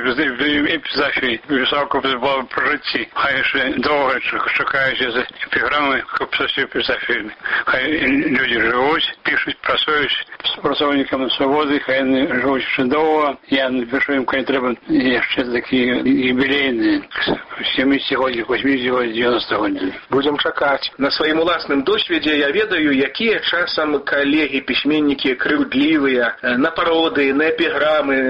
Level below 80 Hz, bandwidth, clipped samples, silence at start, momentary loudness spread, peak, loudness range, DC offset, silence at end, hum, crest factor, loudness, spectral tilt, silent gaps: -48 dBFS; 5.8 kHz; under 0.1%; 0 s; 4 LU; -4 dBFS; 1 LU; under 0.1%; 0 s; none; 12 dB; -17 LUFS; -6.5 dB/octave; none